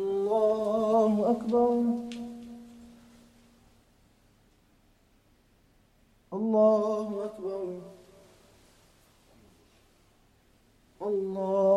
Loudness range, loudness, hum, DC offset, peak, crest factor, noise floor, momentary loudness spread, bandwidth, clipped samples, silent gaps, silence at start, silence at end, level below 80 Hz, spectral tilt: 18 LU; -28 LUFS; none; under 0.1%; -12 dBFS; 18 dB; -64 dBFS; 20 LU; 12.5 kHz; under 0.1%; none; 0 s; 0 s; -66 dBFS; -8 dB/octave